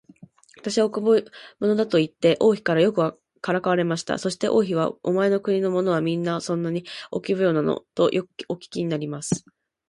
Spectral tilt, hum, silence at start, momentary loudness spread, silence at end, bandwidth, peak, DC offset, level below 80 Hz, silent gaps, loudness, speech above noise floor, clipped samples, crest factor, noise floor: -5.5 dB/octave; none; 0.65 s; 9 LU; 0.5 s; 11.5 kHz; -6 dBFS; under 0.1%; -64 dBFS; none; -23 LUFS; 28 dB; under 0.1%; 16 dB; -50 dBFS